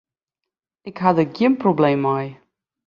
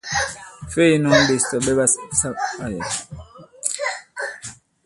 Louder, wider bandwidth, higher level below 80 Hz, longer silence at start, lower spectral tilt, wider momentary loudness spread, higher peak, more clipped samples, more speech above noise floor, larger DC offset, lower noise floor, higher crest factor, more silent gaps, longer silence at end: about the same, -19 LUFS vs -20 LUFS; second, 7 kHz vs 11.5 kHz; second, -64 dBFS vs -46 dBFS; first, 0.85 s vs 0.05 s; first, -9 dB/octave vs -3.5 dB/octave; about the same, 17 LU vs 18 LU; about the same, -2 dBFS vs 0 dBFS; neither; first, 66 dB vs 21 dB; neither; first, -85 dBFS vs -40 dBFS; about the same, 20 dB vs 20 dB; neither; first, 0.55 s vs 0.3 s